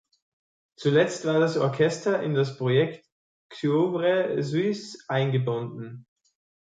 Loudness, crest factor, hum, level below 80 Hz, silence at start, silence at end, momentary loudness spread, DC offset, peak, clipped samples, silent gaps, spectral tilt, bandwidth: -25 LUFS; 18 dB; none; -70 dBFS; 0.8 s; 0.65 s; 8 LU; under 0.1%; -8 dBFS; under 0.1%; 3.12-3.50 s; -6.5 dB/octave; 9.4 kHz